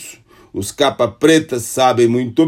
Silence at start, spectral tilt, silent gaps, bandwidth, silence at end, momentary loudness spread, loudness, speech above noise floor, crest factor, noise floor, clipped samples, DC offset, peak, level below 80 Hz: 0 s; -4.5 dB/octave; none; 16 kHz; 0 s; 13 LU; -15 LUFS; 25 dB; 14 dB; -40 dBFS; under 0.1%; under 0.1%; 0 dBFS; -54 dBFS